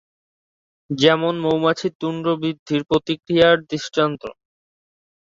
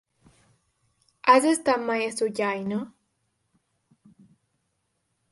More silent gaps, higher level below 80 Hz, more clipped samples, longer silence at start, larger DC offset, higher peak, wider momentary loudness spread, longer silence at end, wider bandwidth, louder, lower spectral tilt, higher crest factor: first, 1.95-2.00 s, 2.59-2.66 s vs none; first, -56 dBFS vs -72 dBFS; neither; second, 0.9 s vs 1.25 s; neither; first, 0 dBFS vs -4 dBFS; second, 9 LU vs 13 LU; second, 0.9 s vs 2.45 s; second, 7.6 kHz vs 11.5 kHz; first, -19 LUFS vs -24 LUFS; first, -5.5 dB/octave vs -4 dB/octave; about the same, 20 dB vs 24 dB